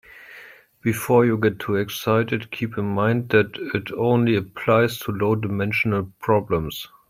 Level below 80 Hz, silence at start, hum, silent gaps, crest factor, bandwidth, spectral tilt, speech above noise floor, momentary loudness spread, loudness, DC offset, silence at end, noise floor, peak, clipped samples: -54 dBFS; 0.15 s; none; none; 18 dB; 16 kHz; -6.5 dB/octave; 25 dB; 9 LU; -22 LUFS; under 0.1%; 0.25 s; -46 dBFS; -4 dBFS; under 0.1%